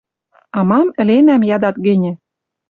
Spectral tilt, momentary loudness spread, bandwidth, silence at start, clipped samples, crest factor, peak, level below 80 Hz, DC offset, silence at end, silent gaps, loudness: -10 dB/octave; 12 LU; 4.7 kHz; 0.55 s; under 0.1%; 12 dB; -2 dBFS; -58 dBFS; under 0.1%; 0.55 s; none; -14 LUFS